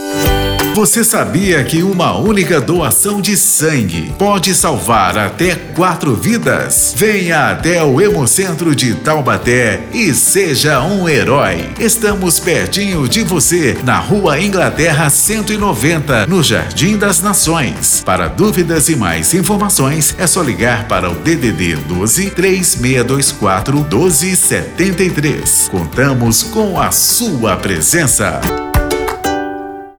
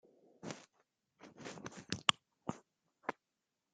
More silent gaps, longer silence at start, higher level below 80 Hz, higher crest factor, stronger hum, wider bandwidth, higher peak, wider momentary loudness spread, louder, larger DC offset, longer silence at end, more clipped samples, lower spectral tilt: neither; second, 0 s vs 0.45 s; first, -30 dBFS vs -78 dBFS; second, 10 dB vs 38 dB; neither; first, over 20 kHz vs 9.6 kHz; first, -2 dBFS vs -8 dBFS; second, 5 LU vs 25 LU; first, -11 LUFS vs -41 LUFS; neither; second, 0.05 s vs 0.6 s; neither; about the same, -3.5 dB/octave vs -2.5 dB/octave